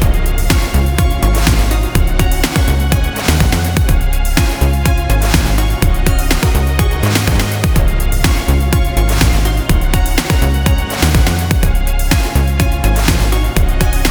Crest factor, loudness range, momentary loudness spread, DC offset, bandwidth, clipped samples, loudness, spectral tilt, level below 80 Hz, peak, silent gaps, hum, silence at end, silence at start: 12 dB; 0 LU; 2 LU; under 0.1%; over 20 kHz; under 0.1%; -14 LUFS; -5 dB/octave; -14 dBFS; 0 dBFS; none; none; 0 s; 0 s